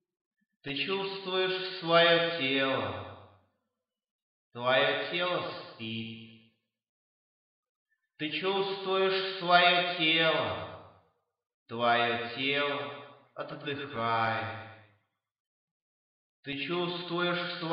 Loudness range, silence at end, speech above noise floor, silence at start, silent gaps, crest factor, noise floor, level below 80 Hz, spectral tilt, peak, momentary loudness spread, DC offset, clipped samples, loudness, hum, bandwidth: 9 LU; 0 s; 57 dB; 0.65 s; 4.11-4.51 s, 6.89-7.63 s, 7.69-7.86 s, 11.54-11.66 s, 15.40-16.43 s; 22 dB; -87 dBFS; -76 dBFS; -7.5 dB/octave; -10 dBFS; 18 LU; under 0.1%; under 0.1%; -29 LUFS; none; 5.6 kHz